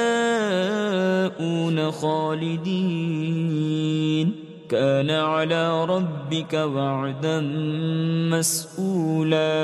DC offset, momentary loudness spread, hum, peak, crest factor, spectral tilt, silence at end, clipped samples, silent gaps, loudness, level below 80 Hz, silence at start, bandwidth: under 0.1%; 4 LU; none; -8 dBFS; 14 dB; -5.5 dB/octave; 0 s; under 0.1%; none; -23 LUFS; -70 dBFS; 0 s; 13.5 kHz